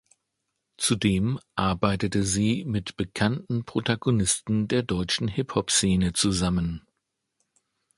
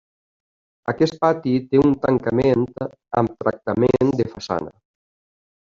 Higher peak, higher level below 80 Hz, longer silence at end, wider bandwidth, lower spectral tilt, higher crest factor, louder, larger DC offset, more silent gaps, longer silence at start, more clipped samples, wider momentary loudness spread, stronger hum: about the same, -6 dBFS vs -4 dBFS; first, -44 dBFS vs -50 dBFS; first, 1.2 s vs 0.95 s; first, 11.5 kHz vs 7.4 kHz; second, -4.5 dB/octave vs -7.5 dB/octave; about the same, 20 dB vs 18 dB; second, -25 LUFS vs -20 LUFS; neither; neither; about the same, 0.8 s vs 0.85 s; neither; second, 6 LU vs 10 LU; neither